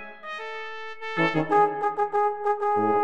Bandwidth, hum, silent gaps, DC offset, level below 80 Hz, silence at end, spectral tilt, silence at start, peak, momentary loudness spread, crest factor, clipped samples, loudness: 8.8 kHz; none; none; under 0.1%; -74 dBFS; 0 s; -6.5 dB/octave; 0 s; -10 dBFS; 13 LU; 16 dB; under 0.1%; -25 LUFS